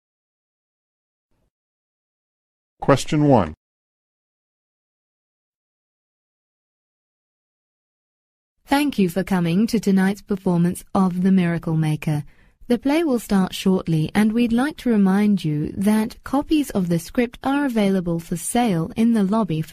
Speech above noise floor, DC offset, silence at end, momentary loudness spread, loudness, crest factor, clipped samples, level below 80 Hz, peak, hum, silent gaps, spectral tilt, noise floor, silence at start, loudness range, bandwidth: over 71 dB; under 0.1%; 0 s; 6 LU; -20 LUFS; 20 dB; under 0.1%; -48 dBFS; -2 dBFS; none; 3.57-8.56 s; -6.5 dB/octave; under -90 dBFS; 2.8 s; 6 LU; 15.5 kHz